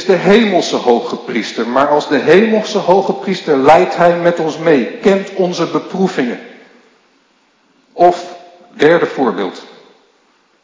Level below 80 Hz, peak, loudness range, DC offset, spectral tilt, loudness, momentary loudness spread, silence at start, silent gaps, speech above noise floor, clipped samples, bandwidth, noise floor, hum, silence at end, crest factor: -56 dBFS; 0 dBFS; 6 LU; under 0.1%; -5.5 dB/octave; -13 LUFS; 10 LU; 0 s; none; 43 dB; 0.5%; 8 kHz; -55 dBFS; none; 1 s; 14 dB